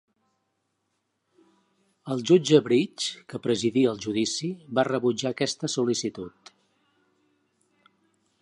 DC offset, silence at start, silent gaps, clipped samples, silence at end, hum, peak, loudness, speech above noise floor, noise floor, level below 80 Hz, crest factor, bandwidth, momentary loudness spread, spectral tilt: under 0.1%; 2.05 s; none; under 0.1%; 2.15 s; none; -4 dBFS; -25 LUFS; 52 dB; -77 dBFS; -70 dBFS; 22 dB; 11 kHz; 13 LU; -4.5 dB/octave